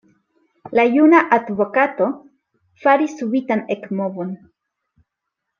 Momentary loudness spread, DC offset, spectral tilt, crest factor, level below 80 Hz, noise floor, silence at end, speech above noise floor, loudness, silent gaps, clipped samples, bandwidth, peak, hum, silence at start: 14 LU; under 0.1%; -7 dB/octave; 18 dB; -68 dBFS; -80 dBFS; 1.25 s; 63 dB; -18 LUFS; none; under 0.1%; 7.2 kHz; -2 dBFS; none; 0.65 s